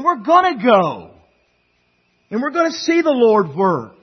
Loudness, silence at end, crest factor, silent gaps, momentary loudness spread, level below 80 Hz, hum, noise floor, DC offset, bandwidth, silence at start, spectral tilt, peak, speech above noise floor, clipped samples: -16 LUFS; 0.15 s; 16 dB; none; 10 LU; -64 dBFS; none; -62 dBFS; under 0.1%; 6.4 kHz; 0 s; -5.5 dB/octave; 0 dBFS; 47 dB; under 0.1%